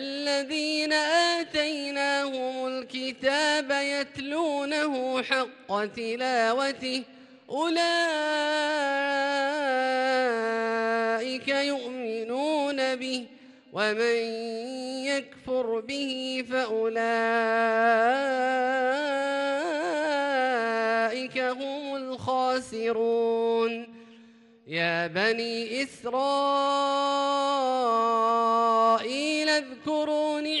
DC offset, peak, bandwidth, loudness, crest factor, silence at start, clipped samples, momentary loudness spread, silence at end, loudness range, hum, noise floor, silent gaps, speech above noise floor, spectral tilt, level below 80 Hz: under 0.1%; -10 dBFS; 11.5 kHz; -26 LUFS; 16 dB; 0 s; under 0.1%; 8 LU; 0 s; 4 LU; none; -54 dBFS; none; 28 dB; -3 dB/octave; -72 dBFS